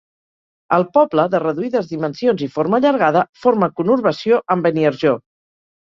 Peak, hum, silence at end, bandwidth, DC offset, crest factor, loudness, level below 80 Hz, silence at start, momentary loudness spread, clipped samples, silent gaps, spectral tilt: -2 dBFS; none; 0.65 s; 7.2 kHz; under 0.1%; 16 dB; -17 LUFS; -62 dBFS; 0.7 s; 6 LU; under 0.1%; 3.29-3.33 s; -7.5 dB/octave